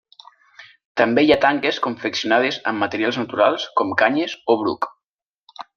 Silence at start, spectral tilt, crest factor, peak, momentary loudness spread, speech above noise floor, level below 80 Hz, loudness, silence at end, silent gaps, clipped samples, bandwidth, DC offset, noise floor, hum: 0.6 s; -4.5 dB/octave; 20 dB; -2 dBFS; 9 LU; 67 dB; -60 dBFS; -19 LUFS; 0.15 s; 0.85-0.95 s, 5.09-5.16 s, 5.26-5.30 s, 5.43-5.47 s; under 0.1%; 7.2 kHz; under 0.1%; -86 dBFS; none